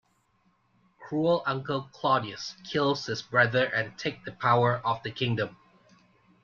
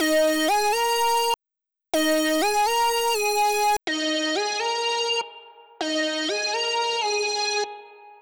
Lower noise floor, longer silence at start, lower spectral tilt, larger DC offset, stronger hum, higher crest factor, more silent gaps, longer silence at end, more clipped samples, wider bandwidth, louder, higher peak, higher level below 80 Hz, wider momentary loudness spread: second, -69 dBFS vs -86 dBFS; first, 1 s vs 0 s; first, -5.5 dB/octave vs 0 dB/octave; neither; neither; first, 22 dB vs 10 dB; neither; first, 0.9 s vs 0.1 s; neither; second, 7.2 kHz vs over 20 kHz; second, -28 LUFS vs -23 LUFS; first, -8 dBFS vs -14 dBFS; second, -66 dBFS vs -60 dBFS; first, 11 LU vs 6 LU